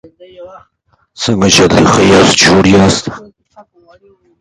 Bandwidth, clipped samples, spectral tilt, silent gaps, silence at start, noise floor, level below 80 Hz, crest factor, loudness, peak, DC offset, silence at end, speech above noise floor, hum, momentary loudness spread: 16 kHz; 0.1%; -4 dB/octave; none; 0.4 s; -43 dBFS; -34 dBFS; 10 dB; -8 LUFS; 0 dBFS; under 0.1%; 1.2 s; 33 dB; none; 10 LU